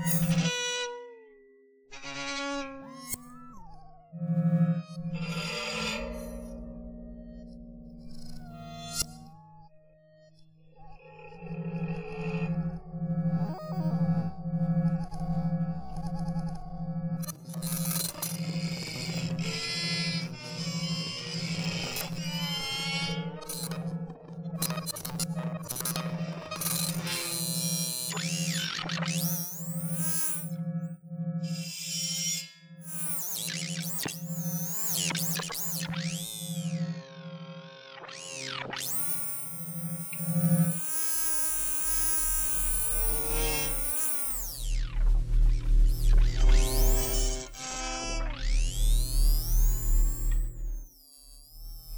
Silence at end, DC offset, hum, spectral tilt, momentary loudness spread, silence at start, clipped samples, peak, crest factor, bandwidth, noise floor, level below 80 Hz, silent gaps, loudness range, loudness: 0 s; under 0.1%; none; -4 dB/octave; 17 LU; 0 s; under 0.1%; -12 dBFS; 18 dB; over 20 kHz; -59 dBFS; -34 dBFS; none; 11 LU; -30 LUFS